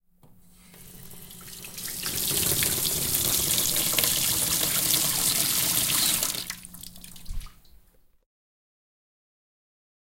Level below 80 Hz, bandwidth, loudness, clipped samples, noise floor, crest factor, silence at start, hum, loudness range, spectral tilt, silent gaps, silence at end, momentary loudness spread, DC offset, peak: -48 dBFS; 17 kHz; -22 LUFS; under 0.1%; -57 dBFS; 26 dB; 0.3 s; none; 7 LU; -1 dB/octave; none; 2.45 s; 21 LU; under 0.1%; -2 dBFS